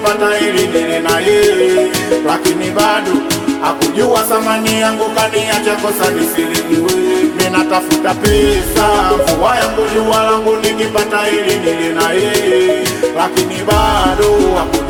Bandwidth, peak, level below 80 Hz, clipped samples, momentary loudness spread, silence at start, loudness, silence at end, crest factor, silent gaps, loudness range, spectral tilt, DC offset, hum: 19 kHz; 0 dBFS; -30 dBFS; under 0.1%; 3 LU; 0 s; -12 LUFS; 0 s; 12 dB; none; 1 LU; -4 dB/octave; under 0.1%; none